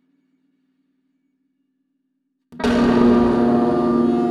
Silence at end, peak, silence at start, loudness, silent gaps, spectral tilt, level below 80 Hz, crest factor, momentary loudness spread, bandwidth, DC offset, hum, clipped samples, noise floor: 0 s; -4 dBFS; 2.5 s; -17 LUFS; none; -7.5 dB/octave; -42 dBFS; 16 dB; 5 LU; 10 kHz; under 0.1%; none; under 0.1%; -72 dBFS